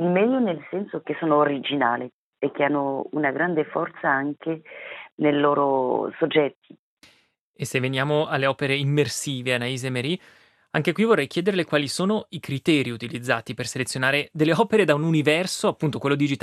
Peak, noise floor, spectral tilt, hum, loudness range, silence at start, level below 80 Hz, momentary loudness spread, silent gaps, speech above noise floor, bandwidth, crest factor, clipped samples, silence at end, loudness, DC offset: -4 dBFS; -62 dBFS; -5 dB/octave; none; 3 LU; 0 s; -70 dBFS; 10 LU; 2.13-2.33 s, 5.12-5.18 s, 6.56-6.62 s, 6.79-6.97 s, 7.41-7.54 s; 39 dB; 14.5 kHz; 20 dB; under 0.1%; 0.05 s; -23 LUFS; under 0.1%